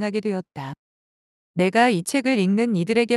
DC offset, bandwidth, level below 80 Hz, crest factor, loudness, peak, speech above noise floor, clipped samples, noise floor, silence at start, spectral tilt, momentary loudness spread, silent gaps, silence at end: under 0.1%; 12.5 kHz; -68 dBFS; 18 dB; -21 LUFS; -4 dBFS; over 69 dB; under 0.1%; under -90 dBFS; 0 s; -5.5 dB/octave; 16 LU; 0.79-1.54 s; 0 s